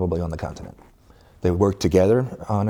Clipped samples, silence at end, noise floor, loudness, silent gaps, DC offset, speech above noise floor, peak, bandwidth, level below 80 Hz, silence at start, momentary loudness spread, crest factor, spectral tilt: under 0.1%; 0 s; -51 dBFS; -21 LUFS; none; under 0.1%; 30 dB; -4 dBFS; 17.5 kHz; -42 dBFS; 0 s; 17 LU; 18 dB; -7.5 dB/octave